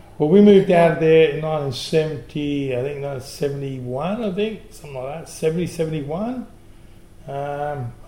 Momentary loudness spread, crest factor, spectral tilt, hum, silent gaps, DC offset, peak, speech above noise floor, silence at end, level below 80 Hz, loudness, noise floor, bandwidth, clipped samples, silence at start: 17 LU; 18 dB; -7 dB/octave; none; none; 0.3%; 0 dBFS; 25 dB; 0.05 s; -48 dBFS; -20 LUFS; -45 dBFS; 16.5 kHz; under 0.1%; 0.2 s